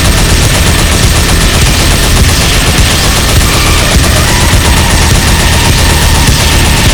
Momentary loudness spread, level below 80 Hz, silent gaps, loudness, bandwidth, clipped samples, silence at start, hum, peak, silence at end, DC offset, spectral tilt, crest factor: 1 LU; -10 dBFS; none; -6 LUFS; over 20 kHz; 3%; 0 s; none; 0 dBFS; 0 s; 3%; -3.5 dB/octave; 6 dB